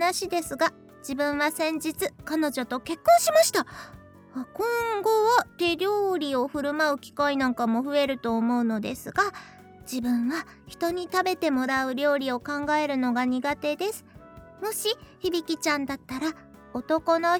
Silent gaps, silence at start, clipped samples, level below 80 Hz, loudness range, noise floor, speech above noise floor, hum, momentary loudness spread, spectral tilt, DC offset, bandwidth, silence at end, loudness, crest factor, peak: none; 0 s; under 0.1%; -60 dBFS; 4 LU; -48 dBFS; 22 dB; none; 12 LU; -3 dB/octave; under 0.1%; over 20 kHz; 0 s; -26 LUFS; 20 dB; -6 dBFS